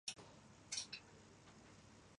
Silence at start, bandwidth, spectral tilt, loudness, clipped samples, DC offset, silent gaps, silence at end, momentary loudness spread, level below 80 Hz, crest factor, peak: 0.05 s; 11.5 kHz; -1 dB/octave; -49 LUFS; under 0.1%; under 0.1%; none; 0 s; 17 LU; -78 dBFS; 26 dB; -30 dBFS